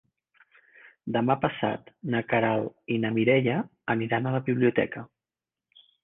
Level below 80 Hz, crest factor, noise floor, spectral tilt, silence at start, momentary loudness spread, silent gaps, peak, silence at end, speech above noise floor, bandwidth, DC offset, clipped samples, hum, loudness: -64 dBFS; 20 dB; under -90 dBFS; -10 dB/octave; 0.85 s; 8 LU; none; -8 dBFS; 1 s; over 64 dB; 3.9 kHz; under 0.1%; under 0.1%; none; -27 LUFS